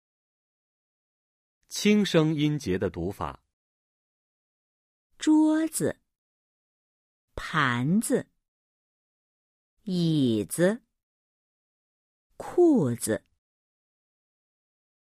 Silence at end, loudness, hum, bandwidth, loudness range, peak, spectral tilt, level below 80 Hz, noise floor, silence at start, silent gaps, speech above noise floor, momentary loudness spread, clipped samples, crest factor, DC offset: 1.9 s; -25 LUFS; none; 15.5 kHz; 3 LU; -10 dBFS; -5.5 dB/octave; -58 dBFS; under -90 dBFS; 1.7 s; 3.53-5.10 s, 6.18-7.28 s, 8.48-9.77 s, 11.03-12.30 s; over 65 dB; 15 LU; under 0.1%; 20 dB; under 0.1%